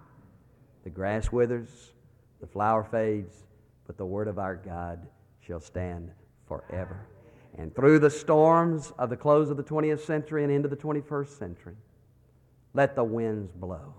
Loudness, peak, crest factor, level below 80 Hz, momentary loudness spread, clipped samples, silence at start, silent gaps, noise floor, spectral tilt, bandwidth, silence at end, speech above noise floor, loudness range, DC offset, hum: -27 LUFS; -8 dBFS; 20 dB; -50 dBFS; 20 LU; under 0.1%; 0.85 s; none; -61 dBFS; -7.5 dB/octave; 10.5 kHz; 0.05 s; 34 dB; 13 LU; under 0.1%; none